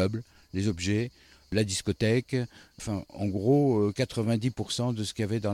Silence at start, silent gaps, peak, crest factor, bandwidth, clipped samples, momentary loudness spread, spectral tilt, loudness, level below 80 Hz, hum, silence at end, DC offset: 0 s; none; -12 dBFS; 16 dB; 15 kHz; under 0.1%; 11 LU; -6 dB/octave; -29 LUFS; -54 dBFS; none; 0 s; under 0.1%